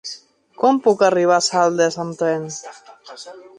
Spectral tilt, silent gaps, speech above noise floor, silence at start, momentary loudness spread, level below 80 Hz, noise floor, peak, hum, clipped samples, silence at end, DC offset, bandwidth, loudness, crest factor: -4 dB/octave; none; 23 dB; 0.05 s; 21 LU; -68 dBFS; -41 dBFS; -2 dBFS; none; under 0.1%; 0.15 s; under 0.1%; 11 kHz; -17 LUFS; 16 dB